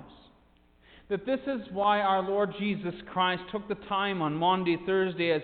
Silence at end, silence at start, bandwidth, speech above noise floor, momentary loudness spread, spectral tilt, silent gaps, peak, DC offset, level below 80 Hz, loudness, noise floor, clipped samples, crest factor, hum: 0 s; 0 s; 4.7 kHz; 34 dB; 9 LU; -9.5 dB/octave; none; -14 dBFS; under 0.1%; -62 dBFS; -29 LUFS; -62 dBFS; under 0.1%; 16 dB; none